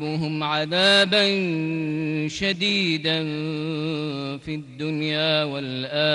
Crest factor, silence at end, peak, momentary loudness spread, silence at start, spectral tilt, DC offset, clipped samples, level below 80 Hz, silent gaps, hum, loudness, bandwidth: 16 dB; 0 s; -6 dBFS; 12 LU; 0 s; -5 dB/octave; under 0.1%; under 0.1%; -58 dBFS; none; none; -22 LUFS; 11.5 kHz